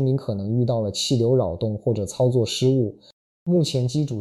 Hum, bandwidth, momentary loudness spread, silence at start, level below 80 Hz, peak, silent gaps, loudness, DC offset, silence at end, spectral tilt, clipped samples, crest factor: none; 12.5 kHz; 5 LU; 0 s; -52 dBFS; -10 dBFS; 3.13-3.46 s; -22 LUFS; under 0.1%; 0 s; -6.5 dB/octave; under 0.1%; 12 dB